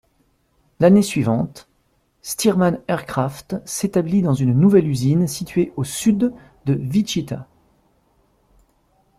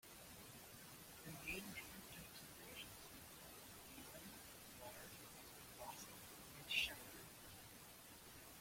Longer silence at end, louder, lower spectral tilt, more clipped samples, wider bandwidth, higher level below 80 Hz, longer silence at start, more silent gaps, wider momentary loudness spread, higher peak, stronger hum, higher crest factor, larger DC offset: first, 1.75 s vs 0 s; first, -19 LUFS vs -52 LUFS; first, -6.5 dB/octave vs -2 dB/octave; neither; about the same, 15.5 kHz vs 16.5 kHz; first, -52 dBFS vs -72 dBFS; first, 0.8 s vs 0.05 s; neither; about the same, 14 LU vs 12 LU; first, -2 dBFS vs -28 dBFS; neither; second, 18 dB vs 28 dB; neither